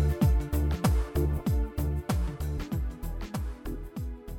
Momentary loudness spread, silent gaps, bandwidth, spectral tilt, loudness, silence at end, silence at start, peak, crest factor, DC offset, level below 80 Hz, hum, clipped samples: 12 LU; none; 19 kHz; -7 dB/octave; -31 LUFS; 0 s; 0 s; -12 dBFS; 16 dB; under 0.1%; -30 dBFS; none; under 0.1%